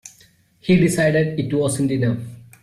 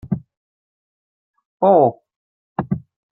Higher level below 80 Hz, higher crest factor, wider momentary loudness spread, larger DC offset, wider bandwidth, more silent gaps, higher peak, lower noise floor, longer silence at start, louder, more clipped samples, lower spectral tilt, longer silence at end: about the same, -52 dBFS vs -54 dBFS; about the same, 16 dB vs 20 dB; about the same, 13 LU vs 15 LU; neither; first, 14.5 kHz vs 4 kHz; second, none vs 0.37-1.34 s, 1.45-1.60 s, 2.16-2.56 s; about the same, -4 dBFS vs -2 dBFS; second, -54 dBFS vs under -90 dBFS; about the same, 0.05 s vs 0.05 s; about the same, -19 LUFS vs -19 LUFS; neither; second, -6 dB/octave vs -12.5 dB/octave; second, 0.2 s vs 0.35 s